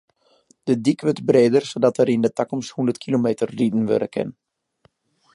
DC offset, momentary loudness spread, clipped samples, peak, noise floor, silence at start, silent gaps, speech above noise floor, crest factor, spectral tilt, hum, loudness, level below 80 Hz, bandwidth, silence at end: under 0.1%; 10 LU; under 0.1%; -2 dBFS; -62 dBFS; 0.65 s; none; 42 dB; 18 dB; -6.5 dB/octave; none; -20 LUFS; -66 dBFS; 11.5 kHz; 1.05 s